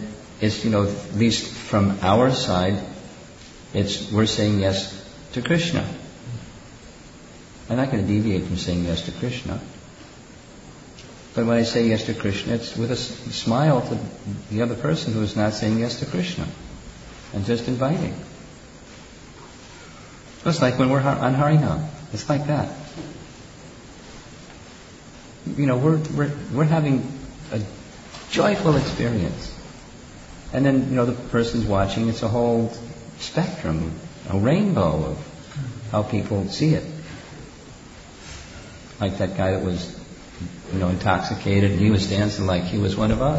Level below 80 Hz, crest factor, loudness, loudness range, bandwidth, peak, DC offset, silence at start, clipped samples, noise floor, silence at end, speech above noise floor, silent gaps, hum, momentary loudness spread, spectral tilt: -44 dBFS; 18 dB; -23 LUFS; 6 LU; 8 kHz; -4 dBFS; under 0.1%; 0 s; under 0.1%; -44 dBFS; 0 s; 22 dB; none; none; 23 LU; -6 dB/octave